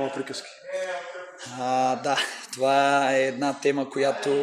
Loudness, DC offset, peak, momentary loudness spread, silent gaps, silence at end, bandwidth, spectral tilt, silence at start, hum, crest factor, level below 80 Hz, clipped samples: -25 LUFS; under 0.1%; -6 dBFS; 14 LU; none; 0 s; 14 kHz; -3.5 dB/octave; 0 s; none; 18 dB; -78 dBFS; under 0.1%